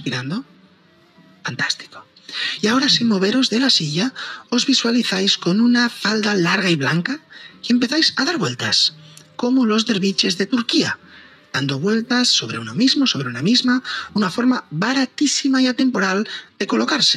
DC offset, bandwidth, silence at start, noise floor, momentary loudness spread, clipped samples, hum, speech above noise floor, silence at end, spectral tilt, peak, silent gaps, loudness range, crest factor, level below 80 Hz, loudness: under 0.1%; 12.5 kHz; 0 s; -53 dBFS; 10 LU; under 0.1%; none; 34 dB; 0 s; -3.5 dB/octave; -4 dBFS; none; 2 LU; 16 dB; -70 dBFS; -18 LUFS